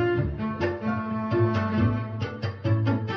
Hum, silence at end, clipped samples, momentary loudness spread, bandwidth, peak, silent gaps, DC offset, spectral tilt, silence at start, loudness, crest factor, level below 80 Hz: none; 0 s; under 0.1%; 6 LU; 6.2 kHz; -12 dBFS; none; under 0.1%; -9 dB/octave; 0 s; -27 LUFS; 14 dB; -44 dBFS